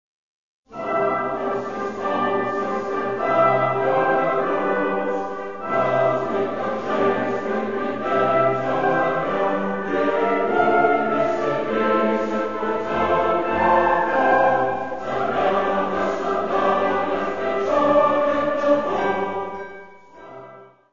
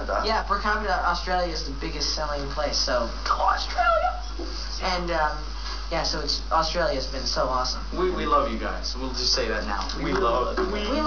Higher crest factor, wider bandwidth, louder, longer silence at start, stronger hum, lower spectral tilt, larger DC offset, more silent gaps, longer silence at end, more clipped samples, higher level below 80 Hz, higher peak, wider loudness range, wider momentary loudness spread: about the same, 16 dB vs 16 dB; first, 7.4 kHz vs 5.4 kHz; first, -21 LUFS vs -25 LUFS; first, 0.6 s vs 0 s; neither; first, -6.5 dB/octave vs -3.5 dB/octave; about the same, 1% vs 1%; neither; about the same, 0 s vs 0 s; neither; second, -54 dBFS vs -32 dBFS; first, -4 dBFS vs -10 dBFS; about the same, 2 LU vs 1 LU; about the same, 8 LU vs 7 LU